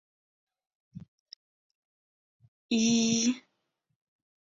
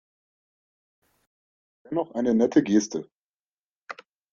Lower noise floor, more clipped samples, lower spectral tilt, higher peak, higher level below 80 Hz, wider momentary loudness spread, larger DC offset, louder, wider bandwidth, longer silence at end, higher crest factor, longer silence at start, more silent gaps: second, -80 dBFS vs under -90 dBFS; neither; second, -3 dB/octave vs -5.5 dB/octave; second, -14 dBFS vs -6 dBFS; about the same, -72 dBFS vs -68 dBFS; second, 8 LU vs 22 LU; neither; second, -27 LUFS vs -24 LUFS; about the same, 7.8 kHz vs 7.6 kHz; first, 1.1 s vs 0.4 s; about the same, 18 dB vs 22 dB; second, 0.95 s vs 1.9 s; first, 1.08-1.26 s, 1.36-2.40 s, 2.48-2.69 s vs 3.12-3.87 s